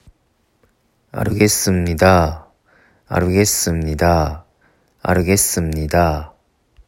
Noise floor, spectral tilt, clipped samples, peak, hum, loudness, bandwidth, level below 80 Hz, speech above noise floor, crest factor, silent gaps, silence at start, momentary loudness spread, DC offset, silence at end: -62 dBFS; -4.5 dB/octave; under 0.1%; 0 dBFS; none; -16 LUFS; 16.5 kHz; -36 dBFS; 47 dB; 18 dB; none; 1.15 s; 12 LU; under 0.1%; 0.6 s